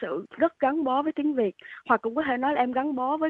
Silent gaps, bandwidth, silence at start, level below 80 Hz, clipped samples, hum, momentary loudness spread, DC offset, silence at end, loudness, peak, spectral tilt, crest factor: none; 4.5 kHz; 0 s; -66 dBFS; under 0.1%; none; 4 LU; under 0.1%; 0 s; -26 LUFS; -8 dBFS; -8 dB/octave; 18 dB